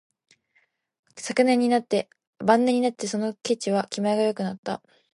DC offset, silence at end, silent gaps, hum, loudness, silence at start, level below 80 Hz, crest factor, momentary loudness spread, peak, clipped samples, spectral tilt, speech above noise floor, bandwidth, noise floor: under 0.1%; 0.4 s; 2.27-2.33 s, 4.58-4.63 s; none; -24 LUFS; 1.15 s; -72 dBFS; 20 dB; 13 LU; -4 dBFS; under 0.1%; -5 dB/octave; 45 dB; 11.5 kHz; -68 dBFS